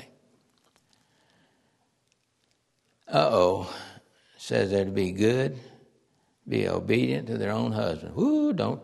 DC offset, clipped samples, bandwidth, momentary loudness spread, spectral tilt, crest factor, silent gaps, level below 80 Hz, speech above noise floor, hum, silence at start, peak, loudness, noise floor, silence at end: under 0.1%; under 0.1%; 12.5 kHz; 10 LU; -6.5 dB/octave; 22 dB; none; -62 dBFS; 46 dB; none; 0 s; -6 dBFS; -26 LUFS; -72 dBFS; 0 s